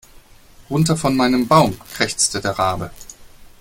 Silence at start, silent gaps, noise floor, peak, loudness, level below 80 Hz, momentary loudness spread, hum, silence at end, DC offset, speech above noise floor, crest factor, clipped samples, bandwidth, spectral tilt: 0.6 s; none; -46 dBFS; 0 dBFS; -18 LUFS; -44 dBFS; 10 LU; none; 0.1 s; under 0.1%; 28 dB; 18 dB; under 0.1%; 17 kHz; -4.5 dB/octave